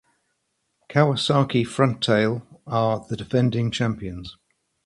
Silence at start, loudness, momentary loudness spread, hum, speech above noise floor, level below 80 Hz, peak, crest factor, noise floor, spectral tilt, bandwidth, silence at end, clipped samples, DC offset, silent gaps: 0.9 s; -22 LUFS; 12 LU; none; 52 dB; -52 dBFS; -2 dBFS; 22 dB; -74 dBFS; -6.5 dB/octave; 11.5 kHz; 0.55 s; under 0.1%; under 0.1%; none